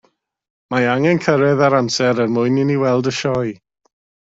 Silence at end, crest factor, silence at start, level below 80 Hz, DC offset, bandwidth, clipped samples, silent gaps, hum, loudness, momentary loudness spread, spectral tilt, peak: 0.75 s; 14 dB; 0.7 s; -56 dBFS; under 0.1%; 7.8 kHz; under 0.1%; none; none; -17 LUFS; 6 LU; -6 dB/octave; -2 dBFS